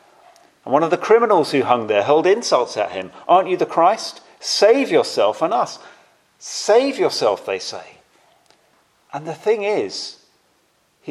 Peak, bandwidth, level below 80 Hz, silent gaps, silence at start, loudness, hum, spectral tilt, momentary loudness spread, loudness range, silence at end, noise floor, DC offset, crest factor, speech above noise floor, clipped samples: 0 dBFS; 12.5 kHz; -74 dBFS; none; 0.65 s; -18 LUFS; none; -3.5 dB/octave; 16 LU; 9 LU; 0 s; -62 dBFS; under 0.1%; 18 dB; 44 dB; under 0.1%